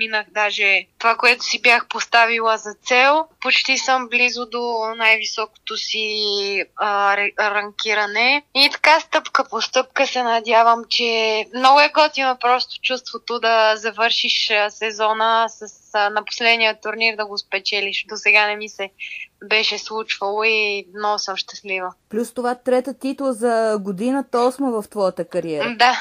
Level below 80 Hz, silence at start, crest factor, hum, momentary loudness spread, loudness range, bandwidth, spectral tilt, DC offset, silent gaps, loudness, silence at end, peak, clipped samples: -70 dBFS; 0 s; 16 dB; none; 10 LU; 5 LU; 15.5 kHz; -1.5 dB/octave; under 0.1%; none; -18 LUFS; 0 s; -2 dBFS; under 0.1%